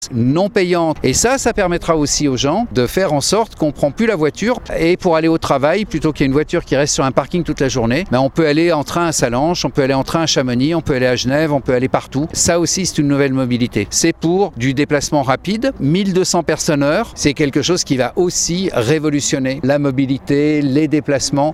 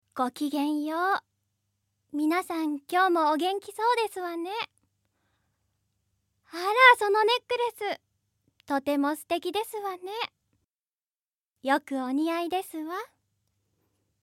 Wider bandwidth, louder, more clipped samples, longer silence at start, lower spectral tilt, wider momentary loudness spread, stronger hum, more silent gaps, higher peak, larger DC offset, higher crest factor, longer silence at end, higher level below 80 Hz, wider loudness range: about the same, 16 kHz vs 17 kHz; first, -15 LUFS vs -27 LUFS; neither; second, 0 s vs 0.15 s; first, -4.5 dB/octave vs -2 dB/octave; second, 3 LU vs 12 LU; neither; second, none vs 10.64-10.74 s, 10.81-10.98 s, 11.07-11.20 s, 11.27-11.52 s; first, 0 dBFS vs -4 dBFS; neither; second, 16 dB vs 26 dB; second, 0 s vs 1.2 s; first, -36 dBFS vs -78 dBFS; second, 1 LU vs 8 LU